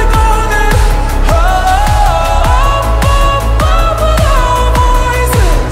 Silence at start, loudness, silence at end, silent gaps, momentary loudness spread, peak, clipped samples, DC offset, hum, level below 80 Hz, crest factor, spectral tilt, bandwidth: 0 s; -11 LUFS; 0 s; none; 1 LU; 0 dBFS; under 0.1%; under 0.1%; none; -10 dBFS; 8 dB; -5 dB/octave; 16 kHz